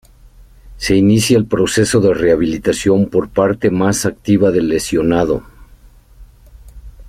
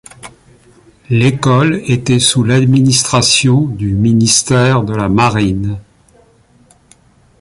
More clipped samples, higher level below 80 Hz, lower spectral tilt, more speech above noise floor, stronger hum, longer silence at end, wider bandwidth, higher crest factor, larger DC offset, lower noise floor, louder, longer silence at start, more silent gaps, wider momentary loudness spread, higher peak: neither; about the same, -38 dBFS vs -38 dBFS; about the same, -5.5 dB/octave vs -4.5 dB/octave; second, 30 dB vs 37 dB; neither; second, 0 s vs 1.6 s; first, 15.5 kHz vs 11.5 kHz; about the same, 14 dB vs 12 dB; neither; second, -43 dBFS vs -48 dBFS; second, -14 LUFS vs -11 LUFS; first, 0.65 s vs 0.25 s; neither; second, 4 LU vs 7 LU; about the same, -2 dBFS vs 0 dBFS